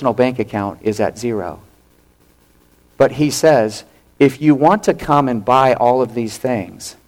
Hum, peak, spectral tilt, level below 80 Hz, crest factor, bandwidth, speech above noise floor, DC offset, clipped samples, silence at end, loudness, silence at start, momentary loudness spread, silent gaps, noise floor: none; -2 dBFS; -6 dB/octave; -48 dBFS; 14 dB; 16.5 kHz; 38 dB; under 0.1%; under 0.1%; 0.15 s; -16 LUFS; 0 s; 10 LU; none; -53 dBFS